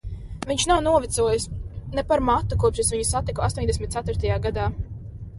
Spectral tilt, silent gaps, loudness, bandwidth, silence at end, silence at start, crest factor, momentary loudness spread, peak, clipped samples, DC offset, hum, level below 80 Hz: -4.5 dB/octave; none; -23 LUFS; 11.5 kHz; 0 s; 0.05 s; 16 dB; 14 LU; -8 dBFS; under 0.1%; under 0.1%; none; -34 dBFS